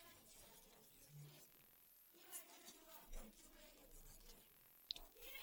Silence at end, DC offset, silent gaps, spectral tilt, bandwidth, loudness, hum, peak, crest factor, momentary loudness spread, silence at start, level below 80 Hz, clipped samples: 0 s; under 0.1%; none; -2 dB/octave; 17.5 kHz; -60 LUFS; none; -26 dBFS; 34 dB; 14 LU; 0 s; -66 dBFS; under 0.1%